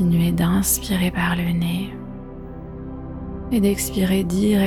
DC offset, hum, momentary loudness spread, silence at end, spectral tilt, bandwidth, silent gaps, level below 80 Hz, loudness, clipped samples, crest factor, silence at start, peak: under 0.1%; none; 16 LU; 0 s; -5.5 dB/octave; 18.5 kHz; none; -36 dBFS; -20 LUFS; under 0.1%; 14 dB; 0 s; -6 dBFS